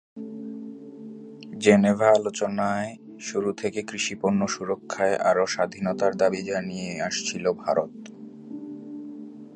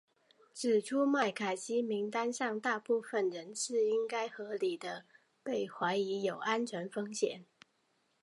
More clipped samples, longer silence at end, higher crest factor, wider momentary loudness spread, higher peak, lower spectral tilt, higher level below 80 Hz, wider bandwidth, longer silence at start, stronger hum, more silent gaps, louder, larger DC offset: neither; second, 0 s vs 0.8 s; about the same, 24 dB vs 20 dB; first, 21 LU vs 8 LU; first, -2 dBFS vs -16 dBFS; about the same, -4.5 dB/octave vs -3.5 dB/octave; first, -64 dBFS vs under -90 dBFS; second, 9.6 kHz vs 11.5 kHz; second, 0.15 s vs 0.55 s; neither; neither; first, -24 LUFS vs -35 LUFS; neither